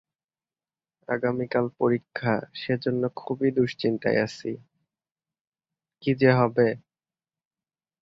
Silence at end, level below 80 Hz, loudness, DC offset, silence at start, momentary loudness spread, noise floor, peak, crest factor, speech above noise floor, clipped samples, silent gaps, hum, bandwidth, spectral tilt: 1.25 s; -66 dBFS; -25 LUFS; under 0.1%; 1.1 s; 11 LU; under -90 dBFS; -6 dBFS; 22 dB; over 65 dB; under 0.1%; 5.41-5.52 s; none; 7.6 kHz; -7.5 dB/octave